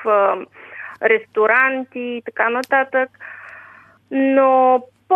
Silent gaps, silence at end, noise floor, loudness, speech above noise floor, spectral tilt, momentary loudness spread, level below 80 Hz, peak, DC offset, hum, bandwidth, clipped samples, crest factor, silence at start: none; 0 s; -45 dBFS; -17 LUFS; 28 dB; -5 dB/octave; 21 LU; -74 dBFS; -2 dBFS; under 0.1%; none; 13 kHz; under 0.1%; 16 dB; 0 s